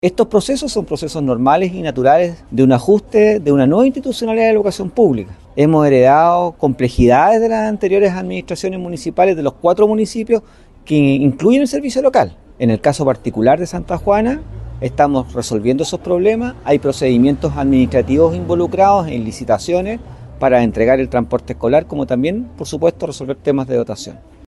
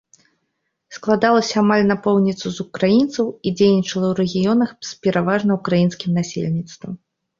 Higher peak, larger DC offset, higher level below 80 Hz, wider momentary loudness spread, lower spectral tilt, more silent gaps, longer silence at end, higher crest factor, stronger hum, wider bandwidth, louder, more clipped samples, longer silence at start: about the same, -2 dBFS vs -2 dBFS; neither; first, -38 dBFS vs -56 dBFS; about the same, 10 LU vs 11 LU; about the same, -6.5 dB/octave vs -6 dB/octave; neither; about the same, 0.35 s vs 0.45 s; about the same, 14 dB vs 16 dB; neither; first, 12.5 kHz vs 7.6 kHz; first, -15 LUFS vs -18 LUFS; neither; second, 0.05 s vs 0.9 s